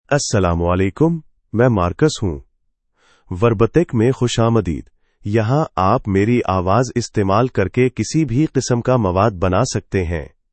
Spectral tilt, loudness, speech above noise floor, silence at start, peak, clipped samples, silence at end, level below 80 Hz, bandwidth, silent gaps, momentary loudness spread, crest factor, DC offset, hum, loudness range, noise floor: -6.5 dB/octave; -17 LUFS; 49 dB; 0.1 s; 0 dBFS; under 0.1%; 0.25 s; -40 dBFS; 8.8 kHz; none; 8 LU; 16 dB; under 0.1%; none; 2 LU; -65 dBFS